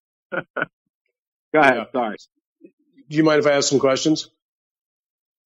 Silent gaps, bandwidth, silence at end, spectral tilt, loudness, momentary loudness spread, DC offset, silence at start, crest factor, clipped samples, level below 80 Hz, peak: 0.50-0.54 s, 0.73-1.05 s, 1.19-1.52 s, 2.41-2.56 s, 2.73-2.78 s; 9 kHz; 1.2 s; -4 dB/octave; -20 LUFS; 14 LU; under 0.1%; 0.3 s; 20 dB; under 0.1%; -68 dBFS; -4 dBFS